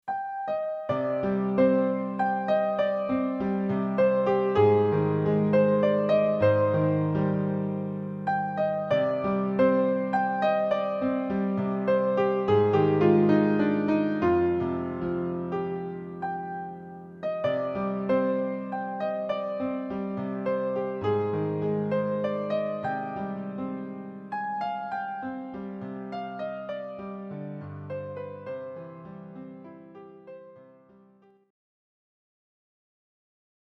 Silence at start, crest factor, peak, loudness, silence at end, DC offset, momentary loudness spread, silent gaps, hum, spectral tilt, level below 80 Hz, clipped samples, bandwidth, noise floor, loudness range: 0.05 s; 18 dB; -8 dBFS; -27 LUFS; 3.1 s; under 0.1%; 15 LU; none; none; -9.5 dB/octave; -62 dBFS; under 0.1%; 6 kHz; -59 dBFS; 13 LU